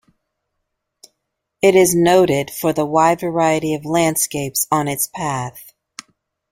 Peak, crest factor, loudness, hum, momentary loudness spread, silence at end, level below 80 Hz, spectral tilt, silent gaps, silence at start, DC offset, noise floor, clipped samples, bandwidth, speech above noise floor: -2 dBFS; 18 dB; -17 LUFS; none; 10 LU; 0.9 s; -56 dBFS; -4.5 dB/octave; none; 1.65 s; under 0.1%; -76 dBFS; under 0.1%; 16.5 kHz; 60 dB